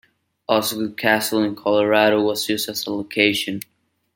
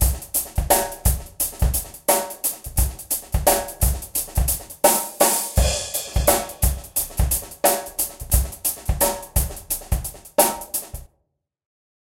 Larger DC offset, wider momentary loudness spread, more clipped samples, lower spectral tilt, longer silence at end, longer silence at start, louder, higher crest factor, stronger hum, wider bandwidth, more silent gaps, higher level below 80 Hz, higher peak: neither; first, 11 LU vs 7 LU; neither; about the same, -3.5 dB/octave vs -3.5 dB/octave; second, 0.55 s vs 1.15 s; first, 0.5 s vs 0 s; about the same, -20 LUFS vs -21 LUFS; about the same, 20 dB vs 22 dB; neither; about the same, 17 kHz vs 16.5 kHz; neither; second, -66 dBFS vs -28 dBFS; about the same, -2 dBFS vs 0 dBFS